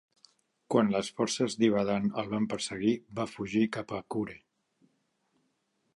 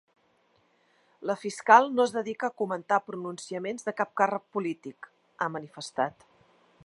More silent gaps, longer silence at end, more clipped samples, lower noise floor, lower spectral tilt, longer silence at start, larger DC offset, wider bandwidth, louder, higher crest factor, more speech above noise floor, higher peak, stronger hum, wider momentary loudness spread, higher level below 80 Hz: neither; first, 1.6 s vs 0.75 s; neither; first, -76 dBFS vs -68 dBFS; about the same, -5 dB/octave vs -4.5 dB/octave; second, 0.7 s vs 1.2 s; neither; about the same, 11.5 kHz vs 11.5 kHz; second, -31 LUFS vs -28 LUFS; second, 20 dB vs 26 dB; first, 47 dB vs 40 dB; second, -12 dBFS vs -4 dBFS; neither; second, 9 LU vs 17 LU; first, -66 dBFS vs -80 dBFS